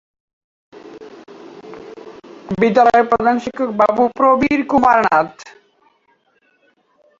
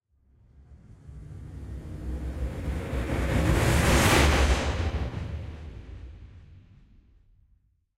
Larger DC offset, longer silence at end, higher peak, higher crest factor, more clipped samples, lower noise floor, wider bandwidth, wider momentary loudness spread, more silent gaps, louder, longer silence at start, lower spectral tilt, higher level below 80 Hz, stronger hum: neither; first, 1.7 s vs 1.4 s; first, -2 dBFS vs -8 dBFS; about the same, 16 dB vs 20 dB; neither; second, -60 dBFS vs -66 dBFS; second, 7.6 kHz vs 16 kHz; about the same, 24 LU vs 24 LU; neither; first, -15 LUFS vs -26 LUFS; about the same, 0.75 s vs 0.7 s; first, -6.5 dB/octave vs -5 dB/octave; second, -52 dBFS vs -32 dBFS; neither